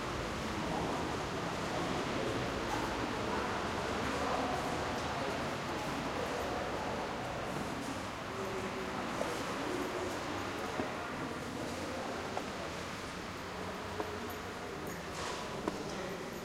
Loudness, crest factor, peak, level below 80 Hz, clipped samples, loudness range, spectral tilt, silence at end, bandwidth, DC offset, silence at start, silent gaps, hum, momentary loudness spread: -38 LUFS; 18 dB; -20 dBFS; -56 dBFS; under 0.1%; 5 LU; -4.5 dB/octave; 0 s; 16 kHz; under 0.1%; 0 s; none; none; 5 LU